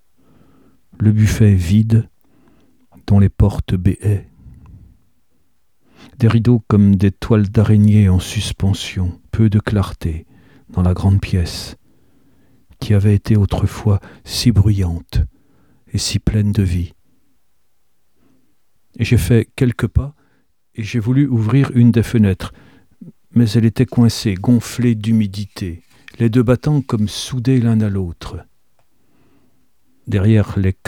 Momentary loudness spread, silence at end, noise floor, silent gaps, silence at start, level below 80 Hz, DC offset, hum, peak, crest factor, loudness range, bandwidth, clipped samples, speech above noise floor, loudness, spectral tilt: 13 LU; 0.15 s; -68 dBFS; none; 1 s; -32 dBFS; 0.2%; none; 0 dBFS; 16 dB; 6 LU; 14.5 kHz; under 0.1%; 54 dB; -16 LUFS; -7 dB/octave